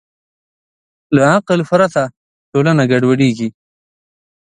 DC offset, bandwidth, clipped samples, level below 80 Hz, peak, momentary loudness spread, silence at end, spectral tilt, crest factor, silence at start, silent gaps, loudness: under 0.1%; 10 kHz; under 0.1%; -58 dBFS; 0 dBFS; 10 LU; 0.9 s; -6.5 dB/octave; 16 dB; 1.1 s; 2.17-2.52 s; -14 LUFS